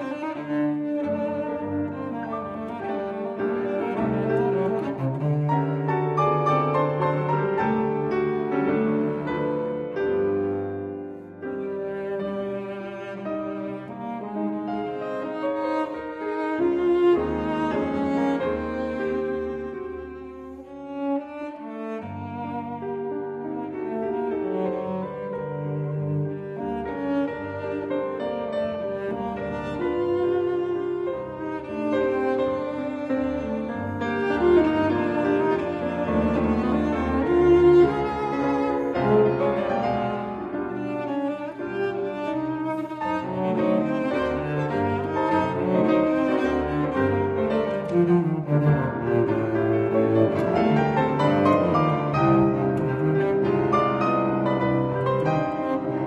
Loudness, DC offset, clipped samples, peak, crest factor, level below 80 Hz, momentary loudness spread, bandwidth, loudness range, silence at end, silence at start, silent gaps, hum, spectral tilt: -25 LUFS; under 0.1%; under 0.1%; -6 dBFS; 18 dB; -48 dBFS; 11 LU; 8.2 kHz; 9 LU; 0 s; 0 s; none; none; -9 dB/octave